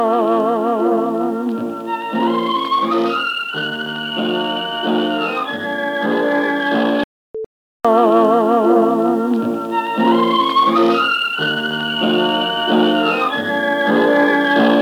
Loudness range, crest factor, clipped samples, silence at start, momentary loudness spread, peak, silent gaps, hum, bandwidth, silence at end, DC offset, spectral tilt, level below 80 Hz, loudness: 4 LU; 14 dB; under 0.1%; 0 s; 8 LU; -2 dBFS; 7.04-7.34 s, 7.46-7.80 s; none; 17.5 kHz; 0 s; under 0.1%; -5.5 dB/octave; -64 dBFS; -16 LUFS